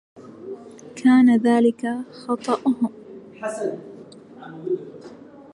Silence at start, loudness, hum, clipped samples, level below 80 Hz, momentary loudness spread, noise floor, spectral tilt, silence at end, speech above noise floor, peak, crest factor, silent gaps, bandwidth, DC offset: 0.15 s; -21 LUFS; none; under 0.1%; -72 dBFS; 26 LU; -43 dBFS; -6 dB/octave; 0.15 s; 23 dB; -6 dBFS; 16 dB; none; 11 kHz; under 0.1%